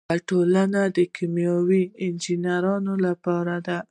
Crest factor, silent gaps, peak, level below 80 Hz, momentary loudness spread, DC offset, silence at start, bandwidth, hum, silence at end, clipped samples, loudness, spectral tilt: 14 dB; none; -10 dBFS; -66 dBFS; 6 LU; under 0.1%; 0.1 s; 10 kHz; none; 0.1 s; under 0.1%; -23 LUFS; -7 dB/octave